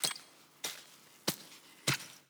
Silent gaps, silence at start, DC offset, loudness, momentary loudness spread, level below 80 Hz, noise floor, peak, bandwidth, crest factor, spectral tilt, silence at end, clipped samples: none; 0 s; under 0.1%; -38 LUFS; 19 LU; -80 dBFS; -57 dBFS; -10 dBFS; over 20 kHz; 30 dB; -2 dB/octave; 0.1 s; under 0.1%